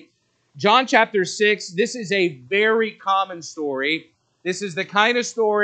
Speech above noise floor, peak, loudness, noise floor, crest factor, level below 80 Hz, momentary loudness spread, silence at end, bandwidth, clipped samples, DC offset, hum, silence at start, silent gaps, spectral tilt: 45 dB; 0 dBFS; -20 LUFS; -65 dBFS; 20 dB; -78 dBFS; 10 LU; 0 s; 9 kHz; under 0.1%; under 0.1%; none; 0.55 s; none; -3.5 dB/octave